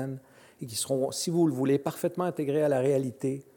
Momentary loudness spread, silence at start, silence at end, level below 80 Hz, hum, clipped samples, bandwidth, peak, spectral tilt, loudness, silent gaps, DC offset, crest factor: 10 LU; 0 s; 0.15 s; -74 dBFS; none; under 0.1%; 17.5 kHz; -14 dBFS; -5.5 dB/octave; -28 LUFS; none; under 0.1%; 16 dB